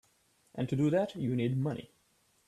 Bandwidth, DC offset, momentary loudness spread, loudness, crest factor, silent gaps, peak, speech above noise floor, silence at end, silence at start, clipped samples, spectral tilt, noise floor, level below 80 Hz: 12.5 kHz; under 0.1%; 12 LU; -33 LUFS; 16 dB; none; -18 dBFS; 40 dB; 0.65 s; 0.55 s; under 0.1%; -8 dB/octave; -71 dBFS; -68 dBFS